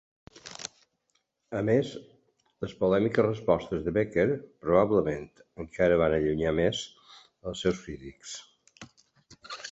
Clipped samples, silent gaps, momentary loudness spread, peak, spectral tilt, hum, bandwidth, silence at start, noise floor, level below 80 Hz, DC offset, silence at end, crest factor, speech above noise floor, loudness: under 0.1%; none; 18 LU; -8 dBFS; -6 dB/octave; none; 8.2 kHz; 0.45 s; -75 dBFS; -52 dBFS; under 0.1%; 0 s; 20 dB; 48 dB; -27 LUFS